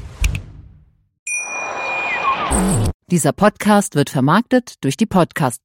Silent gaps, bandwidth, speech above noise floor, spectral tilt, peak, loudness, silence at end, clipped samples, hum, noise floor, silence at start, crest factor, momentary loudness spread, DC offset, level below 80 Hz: 1.19-1.26 s, 2.94-3.00 s; 16.5 kHz; 34 dB; -5 dB/octave; -2 dBFS; -17 LUFS; 0.05 s; under 0.1%; none; -49 dBFS; 0 s; 16 dB; 9 LU; under 0.1%; -30 dBFS